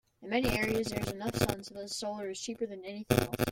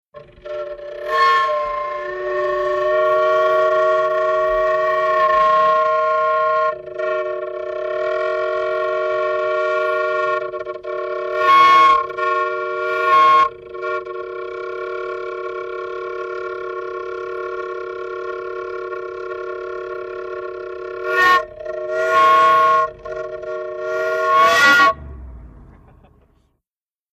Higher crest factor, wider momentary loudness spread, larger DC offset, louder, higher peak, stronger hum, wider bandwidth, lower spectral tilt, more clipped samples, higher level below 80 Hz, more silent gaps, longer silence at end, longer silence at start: first, 24 dB vs 16 dB; second, 9 LU vs 16 LU; neither; second, -33 LUFS vs -18 LUFS; second, -10 dBFS vs -2 dBFS; neither; first, 17 kHz vs 15 kHz; first, -5 dB/octave vs -3.5 dB/octave; neither; about the same, -50 dBFS vs -50 dBFS; neither; second, 0 s vs 1.5 s; about the same, 0.2 s vs 0.15 s